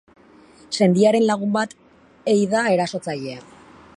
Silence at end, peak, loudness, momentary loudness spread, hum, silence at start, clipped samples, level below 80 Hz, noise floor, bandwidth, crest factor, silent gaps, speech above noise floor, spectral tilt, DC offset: 0.6 s; -4 dBFS; -20 LUFS; 14 LU; none; 0.7 s; under 0.1%; -64 dBFS; -49 dBFS; 11.5 kHz; 18 dB; none; 30 dB; -5.5 dB/octave; under 0.1%